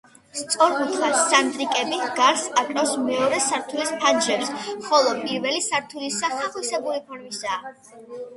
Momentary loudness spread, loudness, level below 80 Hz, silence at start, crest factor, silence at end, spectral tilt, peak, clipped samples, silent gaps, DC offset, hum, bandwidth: 12 LU; -22 LUFS; -70 dBFS; 0.35 s; 20 dB; 0 s; -1.5 dB/octave; -2 dBFS; under 0.1%; none; under 0.1%; none; 12 kHz